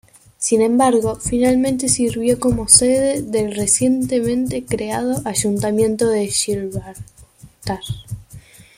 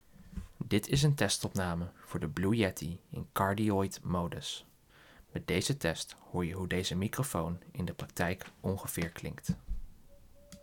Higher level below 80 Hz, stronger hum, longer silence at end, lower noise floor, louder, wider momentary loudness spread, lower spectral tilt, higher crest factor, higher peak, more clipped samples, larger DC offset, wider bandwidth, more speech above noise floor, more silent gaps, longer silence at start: first, -42 dBFS vs -52 dBFS; neither; first, 0.4 s vs 0 s; second, -44 dBFS vs -60 dBFS; first, -17 LUFS vs -34 LUFS; about the same, 14 LU vs 12 LU; about the same, -4 dB/octave vs -5 dB/octave; about the same, 18 dB vs 22 dB; first, 0 dBFS vs -14 dBFS; neither; neither; second, 16 kHz vs 19 kHz; about the same, 27 dB vs 27 dB; neither; first, 0.4 s vs 0.2 s